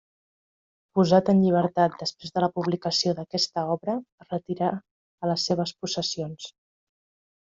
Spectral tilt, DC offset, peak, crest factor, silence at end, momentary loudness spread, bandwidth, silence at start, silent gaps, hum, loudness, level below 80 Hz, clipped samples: -5.5 dB/octave; under 0.1%; -6 dBFS; 20 dB; 0.95 s; 13 LU; 7.8 kHz; 0.95 s; 4.12-4.18 s, 4.91-5.18 s; none; -25 LUFS; -66 dBFS; under 0.1%